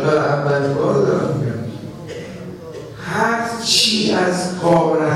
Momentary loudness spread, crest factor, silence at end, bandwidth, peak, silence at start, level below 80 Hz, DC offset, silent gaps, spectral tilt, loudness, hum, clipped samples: 18 LU; 16 dB; 0 s; 15.5 kHz; -2 dBFS; 0 s; -52 dBFS; under 0.1%; none; -4.5 dB/octave; -17 LUFS; none; under 0.1%